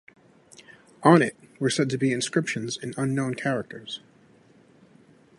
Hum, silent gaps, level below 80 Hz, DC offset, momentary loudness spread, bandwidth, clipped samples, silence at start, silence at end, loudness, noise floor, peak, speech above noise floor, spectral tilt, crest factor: none; none; -68 dBFS; under 0.1%; 16 LU; 11.5 kHz; under 0.1%; 1 s; 1.4 s; -25 LUFS; -57 dBFS; -2 dBFS; 33 dB; -5 dB/octave; 26 dB